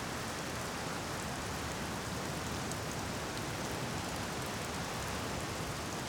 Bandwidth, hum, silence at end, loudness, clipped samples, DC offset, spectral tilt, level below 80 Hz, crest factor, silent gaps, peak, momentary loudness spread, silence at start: over 20 kHz; none; 0 s; -38 LUFS; under 0.1%; under 0.1%; -3.5 dB/octave; -52 dBFS; 14 dB; none; -24 dBFS; 1 LU; 0 s